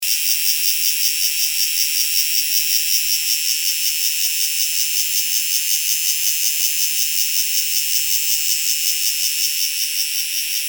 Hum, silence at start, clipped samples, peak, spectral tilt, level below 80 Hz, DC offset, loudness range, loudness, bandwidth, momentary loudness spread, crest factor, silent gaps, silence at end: none; 0 s; under 0.1%; -2 dBFS; 10.5 dB/octave; -78 dBFS; under 0.1%; 1 LU; -15 LUFS; 19.5 kHz; 2 LU; 16 dB; none; 0 s